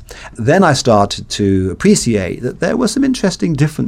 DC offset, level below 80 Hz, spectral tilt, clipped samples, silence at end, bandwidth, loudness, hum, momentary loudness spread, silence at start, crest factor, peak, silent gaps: under 0.1%; -38 dBFS; -5.5 dB/octave; under 0.1%; 0 s; 15 kHz; -14 LUFS; none; 8 LU; 0 s; 14 dB; 0 dBFS; none